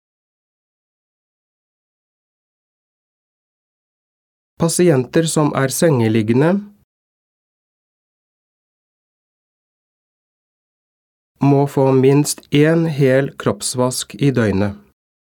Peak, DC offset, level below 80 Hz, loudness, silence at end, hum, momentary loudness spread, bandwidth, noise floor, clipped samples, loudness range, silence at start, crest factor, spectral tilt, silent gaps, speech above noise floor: 0 dBFS; under 0.1%; -58 dBFS; -16 LUFS; 0.55 s; none; 6 LU; 18 kHz; under -90 dBFS; under 0.1%; 8 LU; 4.6 s; 18 dB; -6 dB/octave; 6.84-11.35 s; over 75 dB